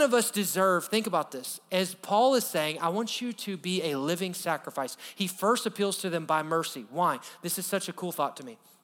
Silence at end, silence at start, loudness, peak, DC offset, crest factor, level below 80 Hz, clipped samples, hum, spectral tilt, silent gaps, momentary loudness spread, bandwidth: 0.3 s; 0 s; -29 LUFS; -12 dBFS; under 0.1%; 18 dB; -86 dBFS; under 0.1%; none; -3.5 dB/octave; none; 10 LU; over 20 kHz